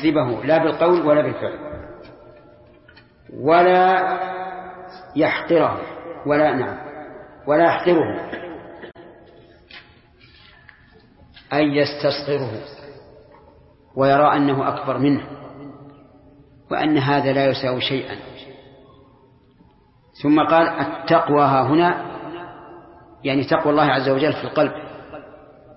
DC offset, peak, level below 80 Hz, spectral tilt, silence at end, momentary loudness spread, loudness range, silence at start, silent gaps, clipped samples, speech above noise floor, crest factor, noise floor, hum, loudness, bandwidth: under 0.1%; -2 dBFS; -56 dBFS; -10.5 dB/octave; 0.45 s; 22 LU; 6 LU; 0 s; none; under 0.1%; 36 dB; 18 dB; -54 dBFS; none; -19 LUFS; 5.8 kHz